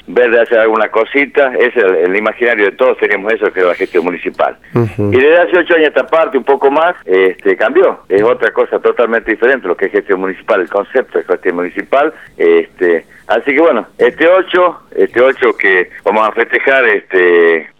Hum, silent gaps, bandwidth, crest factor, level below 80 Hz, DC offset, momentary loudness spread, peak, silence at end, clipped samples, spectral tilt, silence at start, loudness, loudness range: none; none; 6.4 kHz; 12 dB; -52 dBFS; 0.2%; 6 LU; 0 dBFS; 0.15 s; under 0.1%; -7 dB/octave; 0.1 s; -11 LUFS; 3 LU